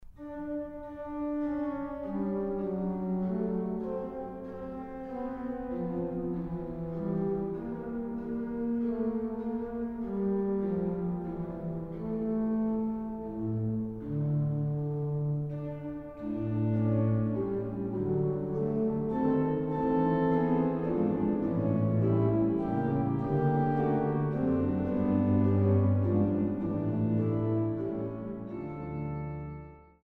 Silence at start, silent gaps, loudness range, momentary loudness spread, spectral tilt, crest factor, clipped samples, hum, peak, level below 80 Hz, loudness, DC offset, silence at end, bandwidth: 0 s; none; 7 LU; 11 LU; -12 dB/octave; 16 dB; under 0.1%; none; -14 dBFS; -52 dBFS; -31 LUFS; under 0.1%; 0.2 s; 4.2 kHz